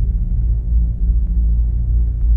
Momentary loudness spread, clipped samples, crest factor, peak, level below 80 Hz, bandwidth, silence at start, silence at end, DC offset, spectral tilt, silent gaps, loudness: 2 LU; under 0.1%; 8 dB; -6 dBFS; -16 dBFS; 0.8 kHz; 0 s; 0 s; under 0.1%; -13 dB/octave; none; -19 LUFS